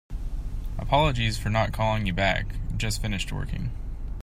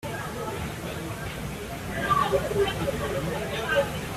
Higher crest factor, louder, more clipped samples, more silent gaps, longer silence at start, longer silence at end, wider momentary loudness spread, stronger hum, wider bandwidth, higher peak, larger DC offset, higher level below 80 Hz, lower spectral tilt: about the same, 18 dB vs 18 dB; about the same, -27 LUFS vs -28 LUFS; neither; neither; about the same, 0.1 s vs 0 s; about the same, 0 s vs 0 s; first, 13 LU vs 10 LU; neither; about the same, 16 kHz vs 16 kHz; about the same, -8 dBFS vs -10 dBFS; neither; first, -32 dBFS vs -44 dBFS; about the same, -5 dB/octave vs -5 dB/octave